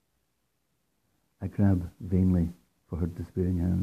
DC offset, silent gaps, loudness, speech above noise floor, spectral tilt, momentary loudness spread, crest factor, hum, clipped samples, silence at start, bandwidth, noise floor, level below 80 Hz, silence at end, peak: under 0.1%; none; -29 LUFS; 50 dB; -10.5 dB/octave; 11 LU; 16 dB; none; under 0.1%; 1.4 s; 5 kHz; -77 dBFS; -52 dBFS; 0 s; -14 dBFS